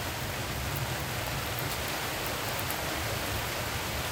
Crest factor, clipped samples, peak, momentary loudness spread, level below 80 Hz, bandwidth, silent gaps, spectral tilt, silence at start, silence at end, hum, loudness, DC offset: 20 dB; under 0.1%; -12 dBFS; 1 LU; -46 dBFS; 19 kHz; none; -3 dB/octave; 0 s; 0 s; none; -32 LUFS; under 0.1%